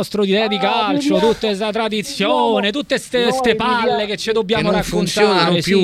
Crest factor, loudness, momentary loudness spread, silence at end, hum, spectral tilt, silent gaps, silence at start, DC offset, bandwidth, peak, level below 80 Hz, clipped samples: 16 dB; -16 LUFS; 5 LU; 0 s; none; -4.5 dB/octave; none; 0 s; under 0.1%; 15.5 kHz; -2 dBFS; -44 dBFS; under 0.1%